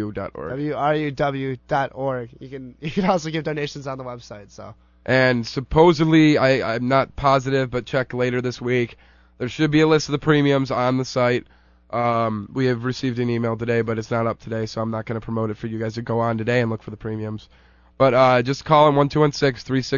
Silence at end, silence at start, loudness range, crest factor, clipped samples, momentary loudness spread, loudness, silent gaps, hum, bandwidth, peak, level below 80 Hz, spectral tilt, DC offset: 0 s; 0 s; 7 LU; 18 dB; under 0.1%; 15 LU; -21 LUFS; none; none; 7.4 kHz; -2 dBFS; -48 dBFS; -6.5 dB/octave; under 0.1%